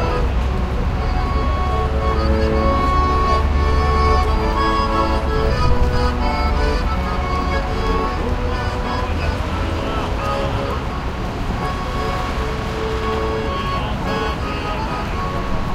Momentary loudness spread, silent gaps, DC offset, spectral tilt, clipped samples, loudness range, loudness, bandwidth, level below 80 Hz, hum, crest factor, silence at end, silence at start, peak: 6 LU; none; under 0.1%; -6.5 dB/octave; under 0.1%; 5 LU; -20 LUFS; 12.5 kHz; -22 dBFS; none; 16 dB; 0 s; 0 s; -2 dBFS